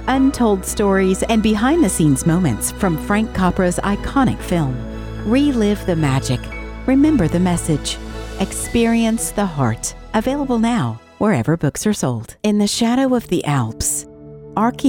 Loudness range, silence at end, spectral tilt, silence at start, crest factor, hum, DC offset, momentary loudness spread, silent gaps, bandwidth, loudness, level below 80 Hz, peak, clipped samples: 3 LU; 0 s; -5.5 dB/octave; 0 s; 14 dB; none; under 0.1%; 9 LU; none; 17.5 kHz; -18 LUFS; -32 dBFS; -4 dBFS; under 0.1%